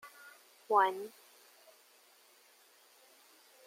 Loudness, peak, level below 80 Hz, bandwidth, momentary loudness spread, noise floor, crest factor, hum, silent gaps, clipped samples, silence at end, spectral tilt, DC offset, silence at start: -32 LUFS; -14 dBFS; under -90 dBFS; 16.5 kHz; 27 LU; -64 dBFS; 24 dB; none; none; under 0.1%; 2.6 s; -2.5 dB/octave; under 0.1%; 0.05 s